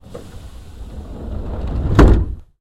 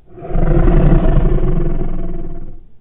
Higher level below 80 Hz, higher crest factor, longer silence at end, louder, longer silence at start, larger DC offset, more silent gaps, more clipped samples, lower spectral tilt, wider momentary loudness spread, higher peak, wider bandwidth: second, -20 dBFS vs -14 dBFS; first, 18 dB vs 12 dB; first, 0.2 s vs 0.05 s; about the same, -17 LUFS vs -17 LUFS; about the same, 0.1 s vs 0.1 s; neither; neither; neither; second, -8 dB/octave vs -12.5 dB/octave; first, 25 LU vs 16 LU; about the same, 0 dBFS vs 0 dBFS; first, 8.8 kHz vs 3.3 kHz